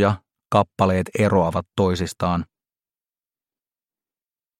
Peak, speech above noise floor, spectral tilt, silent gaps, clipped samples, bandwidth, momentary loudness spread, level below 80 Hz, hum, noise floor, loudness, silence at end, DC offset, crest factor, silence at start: -2 dBFS; over 70 dB; -6.5 dB/octave; none; under 0.1%; 14 kHz; 7 LU; -50 dBFS; none; under -90 dBFS; -21 LUFS; 2.15 s; under 0.1%; 20 dB; 0 s